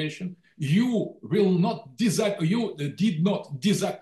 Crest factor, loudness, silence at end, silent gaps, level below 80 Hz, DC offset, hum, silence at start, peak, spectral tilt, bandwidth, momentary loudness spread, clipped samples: 12 dB; -25 LUFS; 0 s; none; -68 dBFS; under 0.1%; none; 0 s; -12 dBFS; -6 dB/octave; 12.5 kHz; 8 LU; under 0.1%